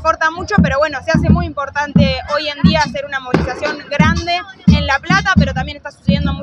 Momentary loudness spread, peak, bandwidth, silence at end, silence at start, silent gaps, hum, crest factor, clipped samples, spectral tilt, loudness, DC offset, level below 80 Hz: 7 LU; 0 dBFS; 8 kHz; 0 s; 0 s; none; none; 14 dB; under 0.1%; -6 dB/octave; -15 LUFS; under 0.1%; -28 dBFS